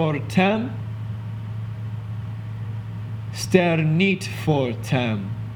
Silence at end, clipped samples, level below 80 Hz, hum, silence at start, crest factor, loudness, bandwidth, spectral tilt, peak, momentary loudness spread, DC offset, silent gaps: 0 s; under 0.1%; -50 dBFS; none; 0 s; 22 dB; -24 LUFS; 18.5 kHz; -6.5 dB/octave; -2 dBFS; 12 LU; under 0.1%; none